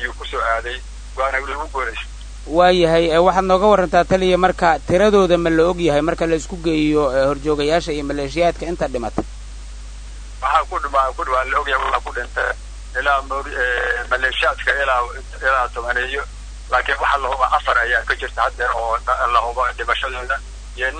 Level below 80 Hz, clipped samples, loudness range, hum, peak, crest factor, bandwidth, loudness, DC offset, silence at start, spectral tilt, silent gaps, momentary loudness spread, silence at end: -32 dBFS; under 0.1%; 6 LU; none; 0 dBFS; 18 dB; 9.6 kHz; -18 LUFS; under 0.1%; 0 s; -5 dB/octave; none; 13 LU; 0 s